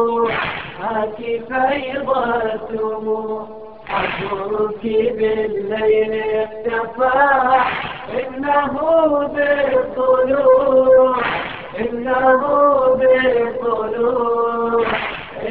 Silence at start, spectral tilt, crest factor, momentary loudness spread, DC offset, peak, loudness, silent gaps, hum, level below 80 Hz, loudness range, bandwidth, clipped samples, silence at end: 0 s; -8.5 dB/octave; 14 dB; 11 LU; 0.5%; -2 dBFS; -17 LUFS; none; none; -48 dBFS; 6 LU; 4.6 kHz; under 0.1%; 0 s